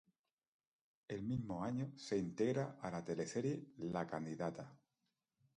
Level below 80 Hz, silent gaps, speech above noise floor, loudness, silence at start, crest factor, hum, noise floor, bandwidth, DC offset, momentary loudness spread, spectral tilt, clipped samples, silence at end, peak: -72 dBFS; none; 47 dB; -43 LUFS; 1.1 s; 18 dB; none; -89 dBFS; 10.5 kHz; under 0.1%; 7 LU; -6.5 dB/octave; under 0.1%; 0.8 s; -26 dBFS